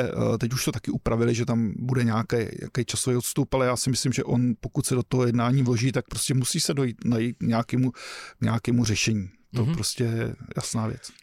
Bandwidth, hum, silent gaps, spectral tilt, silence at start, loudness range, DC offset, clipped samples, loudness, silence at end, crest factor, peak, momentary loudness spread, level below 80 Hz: 16 kHz; none; none; -5 dB/octave; 0 s; 2 LU; under 0.1%; under 0.1%; -25 LUFS; 0.15 s; 12 dB; -14 dBFS; 7 LU; -48 dBFS